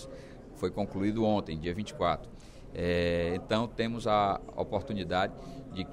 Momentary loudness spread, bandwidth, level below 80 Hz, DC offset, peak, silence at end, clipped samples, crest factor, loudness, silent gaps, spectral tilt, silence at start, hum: 17 LU; 12.5 kHz; -50 dBFS; under 0.1%; -14 dBFS; 0 s; under 0.1%; 18 dB; -32 LUFS; none; -6.5 dB/octave; 0 s; none